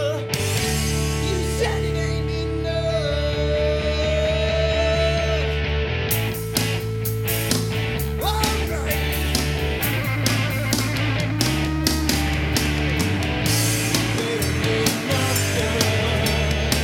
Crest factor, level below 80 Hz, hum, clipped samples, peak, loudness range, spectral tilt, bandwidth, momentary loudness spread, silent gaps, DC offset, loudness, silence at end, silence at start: 20 dB; -30 dBFS; none; under 0.1%; 0 dBFS; 2 LU; -4.5 dB/octave; 19 kHz; 4 LU; none; under 0.1%; -21 LUFS; 0 s; 0 s